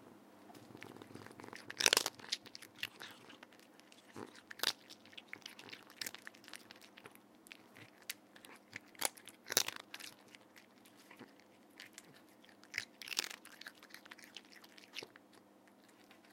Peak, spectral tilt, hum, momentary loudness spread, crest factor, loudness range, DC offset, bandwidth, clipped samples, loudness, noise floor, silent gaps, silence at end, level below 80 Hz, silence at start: -8 dBFS; 0 dB/octave; none; 25 LU; 38 dB; 13 LU; under 0.1%; 16.5 kHz; under 0.1%; -41 LUFS; -65 dBFS; none; 0 s; under -90 dBFS; 0 s